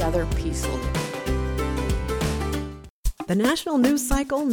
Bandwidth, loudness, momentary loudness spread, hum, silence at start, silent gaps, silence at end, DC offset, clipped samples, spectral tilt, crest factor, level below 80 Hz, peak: 19.5 kHz; -25 LUFS; 10 LU; none; 0 s; 2.90-3.03 s; 0 s; under 0.1%; under 0.1%; -5.5 dB/octave; 16 dB; -30 dBFS; -8 dBFS